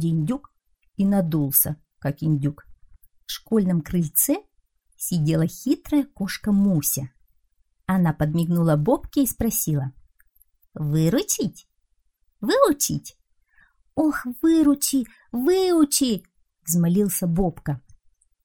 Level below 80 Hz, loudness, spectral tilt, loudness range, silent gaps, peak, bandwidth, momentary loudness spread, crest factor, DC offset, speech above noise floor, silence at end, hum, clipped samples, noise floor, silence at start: -48 dBFS; -22 LUFS; -5.5 dB/octave; 3 LU; none; -2 dBFS; 19.5 kHz; 12 LU; 20 dB; 0.1%; 48 dB; 0.65 s; none; under 0.1%; -69 dBFS; 0 s